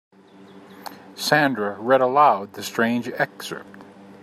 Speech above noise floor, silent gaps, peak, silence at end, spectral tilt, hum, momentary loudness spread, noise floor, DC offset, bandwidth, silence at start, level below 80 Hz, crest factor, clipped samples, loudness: 26 dB; none; -2 dBFS; 0.1 s; -4.5 dB/octave; none; 22 LU; -47 dBFS; under 0.1%; 15.5 kHz; 0.55 s; -72 dBFS; 20 dB; under 0.1%; -20 LUFS